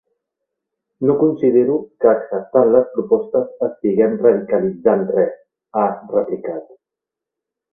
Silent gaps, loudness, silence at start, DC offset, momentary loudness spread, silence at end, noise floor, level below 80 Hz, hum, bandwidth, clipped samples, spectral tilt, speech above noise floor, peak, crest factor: none; -17 LUFS; 1 s; under 0.1%; 8 LU; 1.1 s; -85 dBFS; -60 dBFS; none; 2.8 kHz; under 0.1%; -13 dB/octave; 69 dB; 0 dBFS; 18 dB